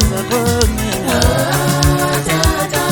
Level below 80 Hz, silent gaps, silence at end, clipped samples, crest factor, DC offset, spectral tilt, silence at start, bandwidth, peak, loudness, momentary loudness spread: -22 dBFS; none; 0 s; under 0.1%; 14 dB; under 0.1%; -4.5 dB/octave; 0 s; 19.5 kHz; 0 dBFS; -14 LUFS; 3 LU